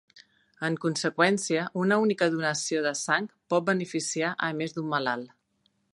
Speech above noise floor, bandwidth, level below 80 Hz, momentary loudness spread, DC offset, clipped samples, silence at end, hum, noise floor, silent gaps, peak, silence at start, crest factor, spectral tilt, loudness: 45 dB; 11.5 kHz; -76 dBFS; 7 LU; under 0.1%; under 0.1%; 0.65 s; none; -72 dBFS; none; -8 dBFS; 0.15 s; 20 dB; -4 dB/octave; -27 LUFS